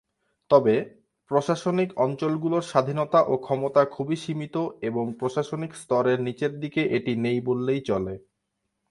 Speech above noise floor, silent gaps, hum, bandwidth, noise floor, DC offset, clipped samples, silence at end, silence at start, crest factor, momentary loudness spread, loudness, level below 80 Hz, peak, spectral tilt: 55 dB; none; none; 11.5 kHz; -79 dBFS; under 0.1%; under 0.1%; 0.7 s; 0.5 s; 22 dB; 8 LU; -25 LUFS; -62 dBFS; -4 dBFS; -7 dB/octave